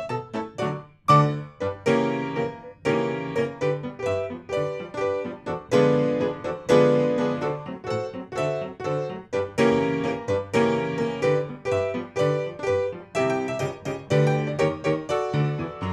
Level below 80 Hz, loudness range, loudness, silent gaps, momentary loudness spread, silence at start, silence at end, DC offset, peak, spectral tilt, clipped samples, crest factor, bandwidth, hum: -58 dBFS; 3 LU; -25 LUFS; none; 10 LU; 0 s; 0 s; under 0.1%; -6 dBFS; -6.5 dB/octave; under 0.1%; 20 dB; 11.5 kHz; none